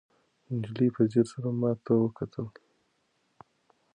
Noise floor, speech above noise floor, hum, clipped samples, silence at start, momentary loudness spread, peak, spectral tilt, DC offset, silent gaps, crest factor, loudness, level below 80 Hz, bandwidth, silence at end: -73 dBFS; 46 dB; none; under 0.1%; 0.5 s; 11 LU; -10 dBFS; -9 dB/octave; under 0.1%; none; 20 dB; -29 LUFS; -68 dBFS; 9.8 kHz; 1.45 s